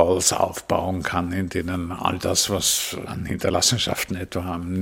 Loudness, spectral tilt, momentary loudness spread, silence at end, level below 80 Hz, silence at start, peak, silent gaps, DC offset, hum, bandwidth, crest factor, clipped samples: -23 LUFS; -3 dB/octave; 9 LU; 0 s; -48 dBFS; 0 s; -2 dBFS; none; under 0.1%; none; 17 kHz; 22 dB; under 0.1%